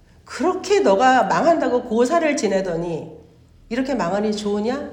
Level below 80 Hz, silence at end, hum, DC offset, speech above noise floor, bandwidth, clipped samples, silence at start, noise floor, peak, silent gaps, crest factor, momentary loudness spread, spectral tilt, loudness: -52 dBFS; 0 s; none; under 0.1%; 30 dB; 11 kHz; under 0.1%; 0.25 s; -49 dBFS; -2 dBFS; none; 16 dB; 13 LU; -5 dB/octave; -19 LUFS